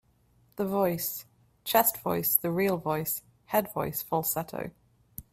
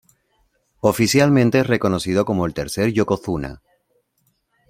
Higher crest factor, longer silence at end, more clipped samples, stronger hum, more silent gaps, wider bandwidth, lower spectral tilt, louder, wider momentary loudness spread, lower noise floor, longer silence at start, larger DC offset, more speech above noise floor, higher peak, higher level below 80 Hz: first, 24 dB vs 18 dB; second, 0.1 s vs 1.15 s; neither; neither; neither; about the same, 16 kHz vs 16.5 kHz; about the same, -4.5 dB/octave vs -5.5 dB/octave; second, -28 LUFS vs -19 LUFS; first, 16 LU vs 9 LU; about the same, -65 dBFS vs -67 dBFS; second, 0.55 s vs 0.85 s; neither; second, 37 dB vs 49 dB; second, -6 dBFS vs -2 dBFS; second, -62 dBFS vs -48 dBFS